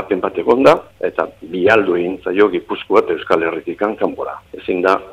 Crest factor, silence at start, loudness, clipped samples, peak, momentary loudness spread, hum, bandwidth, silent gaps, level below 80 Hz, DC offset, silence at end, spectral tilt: 16 dB; 0 s; -16 LUFS; under 0.1%; 0 dBFS; 11 LU; none; 11.5 kHz; none; -52 dBFS; under 0.1%; 0 s; -6 dB/octave